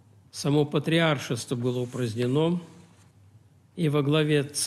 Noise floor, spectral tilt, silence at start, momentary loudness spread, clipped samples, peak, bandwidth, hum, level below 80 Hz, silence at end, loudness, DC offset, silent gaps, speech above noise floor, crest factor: -56 dBFS; -5.5 dB/octave; 0.35 s; 8 LU; under 0.1%; -10 dBFS; 14 kHz; none; -66 dBFS; 0 s; -26 LUFS; under 0.1%; none; 31 dB; 16 dB